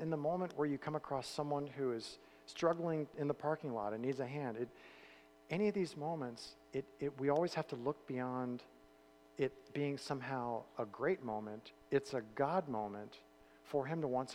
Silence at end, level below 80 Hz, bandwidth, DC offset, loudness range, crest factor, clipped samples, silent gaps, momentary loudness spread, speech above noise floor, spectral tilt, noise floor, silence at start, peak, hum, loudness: 0 s; -76 dBFS; 15 kHz; under 0.1%; 2 LU; 20 dB; under 0.1%; none; 13 LU; 25 dB; -6.5 dB/octave; -65 dBFS; 0 s; -20 dBFS; none; -40 LUFS